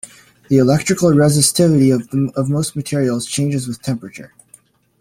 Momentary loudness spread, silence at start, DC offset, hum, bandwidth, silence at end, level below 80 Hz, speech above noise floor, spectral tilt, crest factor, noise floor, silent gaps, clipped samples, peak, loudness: 12 LU; 0.05 s; under 0.1%; none; 16.5 kHz; 0.75 s; -50 dBFS; 34 dB; -5.5 dB/octave; 16 dB; -50 dBFS; none; under 0.1%; 0 dBFS; -16 LUFS